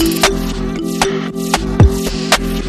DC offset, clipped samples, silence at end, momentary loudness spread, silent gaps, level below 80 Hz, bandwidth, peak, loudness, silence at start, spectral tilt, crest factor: under 0.1%; under 0.1%; 0 s; 8 LU; none; -22 dBFS; 14.5 kHz; 0 dBFS; -15 LUFS; 0 s; -4.5 dB/octave; 14 dB